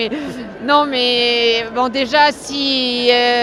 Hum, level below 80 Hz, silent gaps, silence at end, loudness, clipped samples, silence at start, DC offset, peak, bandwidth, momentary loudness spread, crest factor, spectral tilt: none; -52 dBFS; none; 0 s; -14 LUFS; under 0.1%; 0 s; under 0.1%; 0 dBFS; 12 kHz; 9 LU; 16 dB; -2.5 dB/octave